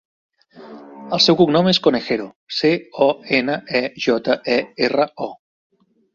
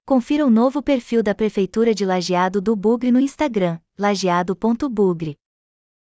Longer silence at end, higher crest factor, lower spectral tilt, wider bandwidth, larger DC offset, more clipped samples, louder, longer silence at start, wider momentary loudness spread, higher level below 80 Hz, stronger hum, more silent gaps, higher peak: about the same, 0.8 s vs 0.85 s; about the same, 18 dB vs 14 dB; about the same, -5 dB/octave vs -6 dB/octave; about the same, 7.6 kHz vs 8 kHz; neither; neither; about the same, -18 LUFS vs -19 LUFS; first, 0.55 s vs 0.05 s; first, 11 LU vs 5 LU; second, -60 dBFS vs -52 dBFS; neither; first, 2.36-2.47 s vs none; first, -2 dBFS vs -6 dBFS